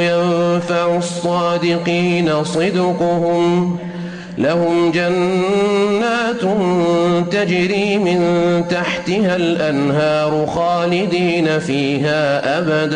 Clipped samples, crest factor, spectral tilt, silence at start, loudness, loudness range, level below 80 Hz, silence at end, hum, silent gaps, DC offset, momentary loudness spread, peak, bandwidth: under 0.1%; 8 dB; -6 dB/octave; 0 s; -16 LUFS; 1 LU; -52 dBFS; 0 s; none; none; under 0.1%; 3 LU; -6 dBFS; 10 kHz